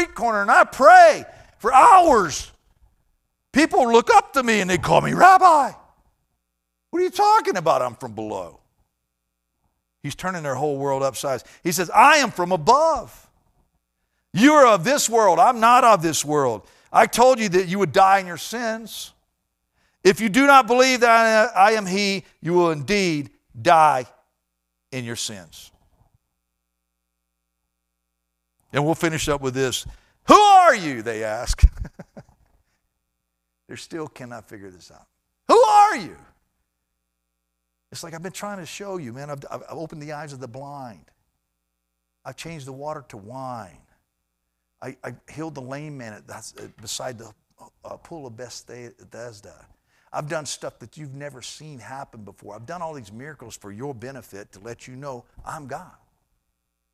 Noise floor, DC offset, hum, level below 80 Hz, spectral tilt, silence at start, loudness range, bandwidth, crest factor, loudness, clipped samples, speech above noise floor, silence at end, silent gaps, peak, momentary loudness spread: -77 dBFS; under 0.1%; none; -40 dBFS; -4 dB/octave; 0 s; 20 LU; 15.5 kHz; 20 dB; -17 LUFS; under 0.1%; 58 dB; 1.1 s; none; 0 dBFS; 25 LU